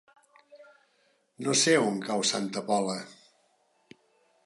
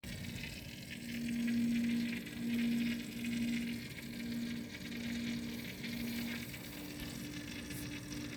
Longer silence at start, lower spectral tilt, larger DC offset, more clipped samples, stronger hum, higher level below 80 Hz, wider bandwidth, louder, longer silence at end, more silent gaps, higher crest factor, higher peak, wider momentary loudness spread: first, 0.55 s vs 0.05 s; second, -3 dB/octave vs -4.5 dB/octave; neither; neither; neither; second, -82 dBFS vs -60 dBFS; second, 11.5 kHz vs over 20 kHz; first, -27 LUFS vs -40 LUFS; first, 1.3 s vs 0 s; neither; first, 22 dB vs 14 dB; first, -10 dBFS vs -26 dBFS; first, 14 LU vs 10 LU